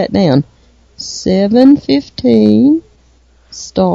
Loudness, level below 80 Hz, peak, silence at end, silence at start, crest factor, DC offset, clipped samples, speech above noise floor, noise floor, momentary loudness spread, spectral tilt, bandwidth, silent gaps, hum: -11 LUFS; -44 dBFS; 0 dBFS; 0 s; 0 s; 12 dB; under 0.1%; 0.5%; 38 dB; -48 dBFS; 19 LU; -6.5 dB/octave; 7.8 kHz; none; none